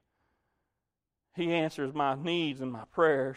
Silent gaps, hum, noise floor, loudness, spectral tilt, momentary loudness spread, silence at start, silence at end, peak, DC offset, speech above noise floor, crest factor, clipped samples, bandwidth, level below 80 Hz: none; none; -88 dBFS; -31 LUFS; -6 dB/octave; 10 LU; 1.35 s; 0 s; -12 dBFS; under 0.1%; 58 dB; 20 dB; under 0.1%; 11.5 kHz; -72 dBFS